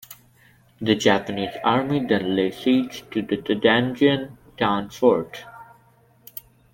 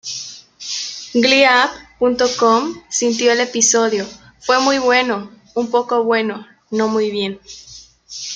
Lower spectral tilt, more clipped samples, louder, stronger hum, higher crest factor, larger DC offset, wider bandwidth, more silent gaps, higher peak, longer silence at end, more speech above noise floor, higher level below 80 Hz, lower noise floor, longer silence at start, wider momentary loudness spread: first, -5.5 dB/octave vs -2 dB/octave; neither; second, -22 LUFS vs -16 LUFS; neither; about the same, 20 dB vs 16 dB; neither; first, 17 kHz vs 9.4 kHz; neither; about the same, -2 dBFS vs -2 dBFS; first, 1.1 s vs 0 s; first, 36 dB vs 23 dB; about the same, -58 dBFS vs -58 dBFS; first, -57 dBFS vs -39 dBFS; about the same, 0.1 s vs 0.05 s; first, 20 LU vs 17 LU